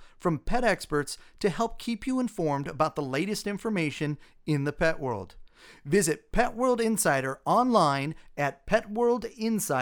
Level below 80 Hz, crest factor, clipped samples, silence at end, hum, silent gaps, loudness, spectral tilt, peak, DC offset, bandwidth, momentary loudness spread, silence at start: -44 dBFS; 18 dB; under 0.1%; 0 s; none; none; -28 LUFS; -5 dB/octave; -10 dBFS; under 0.1%; over 20 kHz; 9 LU; 0 s